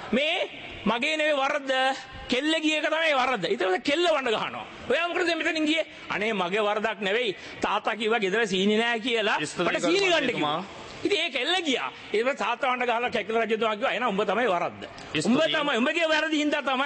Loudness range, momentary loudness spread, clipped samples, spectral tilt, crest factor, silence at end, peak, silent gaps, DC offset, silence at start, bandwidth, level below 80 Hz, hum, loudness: 2 LU; 6 LU; under 0.1%; -3.5 dB/octave; 14 dB; 0 s; -12 dBFS; none; under 0.1%; 0 s; 8.8 kHz; -62 dBFS; none; -25 LUFS